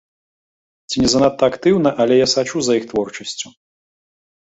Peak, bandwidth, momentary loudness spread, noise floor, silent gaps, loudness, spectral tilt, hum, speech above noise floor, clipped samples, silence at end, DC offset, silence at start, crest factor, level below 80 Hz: -2 dBFS; 8.4 kHz; 12 LU; under -90 dBFS; none; -17 LUFS; -4 dB/octave; none; over 74 dB; under 0.1%; 1 s; under 0.1%; 0.9 s; 16 dB; -48 dBFS